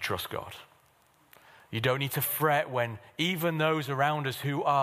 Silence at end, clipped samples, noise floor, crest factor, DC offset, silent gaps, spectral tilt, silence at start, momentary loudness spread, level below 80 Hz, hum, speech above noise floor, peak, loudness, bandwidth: 0 s; under 0.1%; -64 dBFS; 20 dB; under 0.1%; none; -4.5 dB/octave; 0 s; 11 LU; -66 dBFS; none; 35 dB; -10 dBFS; -29 LUFS; 15.5 kHz